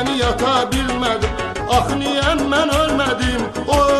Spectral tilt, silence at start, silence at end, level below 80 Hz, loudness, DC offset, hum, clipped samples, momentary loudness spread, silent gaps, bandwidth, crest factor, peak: -4.5 dB/octave; 0 s; 0 s; -30 dBFS; -18 LUFS; under 0.1%; none; under 0.1%; 4 LU; none; 13.5 kHz; 14 dB; -2 dBFS